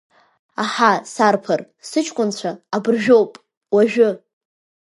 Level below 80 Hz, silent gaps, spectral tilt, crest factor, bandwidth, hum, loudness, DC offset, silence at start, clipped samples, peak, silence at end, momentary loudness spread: -70 dBFS; 3.57-3.61 s; -4.5 dB/octave; 18 dB; 11.5 kHz; none; -18 LUFS; under 0.1%; 0.6 s; under 0.1%; 0 dBFS; 0.8 s; 11 LU